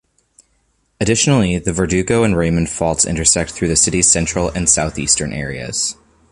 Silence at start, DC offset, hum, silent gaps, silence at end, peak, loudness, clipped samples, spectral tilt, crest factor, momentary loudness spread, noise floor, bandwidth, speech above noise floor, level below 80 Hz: 1 s; under 0.1%; none; none; 0.4 s; 0 dBFS; -15 LUFS; under 0.1%; -3.5 dB/octave; 16 dB; 8 LU; -62 dBFS; 11.5 kHz; 46 dB; -34 dBFS